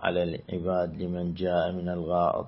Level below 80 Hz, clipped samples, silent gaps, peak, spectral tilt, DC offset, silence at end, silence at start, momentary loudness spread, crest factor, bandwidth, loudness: -54 dBFS; under 0.1%; none; -10 dBFS; -11 dB/octave; under 0.1%; 0 s; 0 s; 6 LU; 20 dB; 5.8 kHz; -29 LUFS